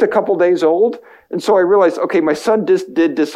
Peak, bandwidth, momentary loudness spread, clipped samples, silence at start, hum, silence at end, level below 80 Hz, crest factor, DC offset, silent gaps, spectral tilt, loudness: -2 dBFS; 13 kHz; 6 LU; under 0.1%; 0 s; none; 0 s; -62 dBFS; 12 dB; under 0.1%; none; -5.5 dB/octave; -14 LUFS